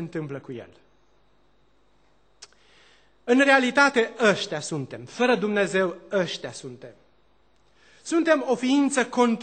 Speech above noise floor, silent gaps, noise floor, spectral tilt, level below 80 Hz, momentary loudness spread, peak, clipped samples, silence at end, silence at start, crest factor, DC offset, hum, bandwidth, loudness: 41 dB; none; -64 dBFS; -4 dB/octave; -70 dBFS; 21 LU; -4 dBFS; under 0.1%; 0 s; 0 s; 22 dB; under 0.1%; none; 9 kHz; -23 LUFS